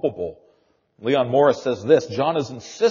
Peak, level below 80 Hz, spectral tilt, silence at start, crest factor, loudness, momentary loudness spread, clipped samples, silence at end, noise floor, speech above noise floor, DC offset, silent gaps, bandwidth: -4 dBFS; -62 dBFS; -4.5 dB/octave; 0.05 s; 18 dB; -20 LUFS; 14 LU; under 0.1%; 0 s; -62 dBFS; 42 dB; under 0.1%; none; 7.2 kHz